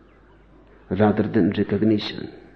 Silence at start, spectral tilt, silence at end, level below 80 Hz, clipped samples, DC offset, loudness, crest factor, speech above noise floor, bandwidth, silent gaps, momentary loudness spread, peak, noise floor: 0.9 s; -9 dB/octave; 0.15 s; -54 dBFS; under 0.1%; under 0.1%; -21 LUFS; 18 dB; 31 dB; 6.2 kHz; none; 11 LU; -4 dBFS; -52 dBFS